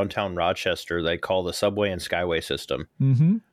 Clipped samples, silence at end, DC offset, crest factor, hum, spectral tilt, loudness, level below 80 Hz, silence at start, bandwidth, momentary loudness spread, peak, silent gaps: under 0.1%; 0.15 s; under 0.1%; 14 dB; none; -6 dB/octave; -25 LUFS; -50 dBFS; 0 s; 15 kHz; 6 LU; -10 dBFS; none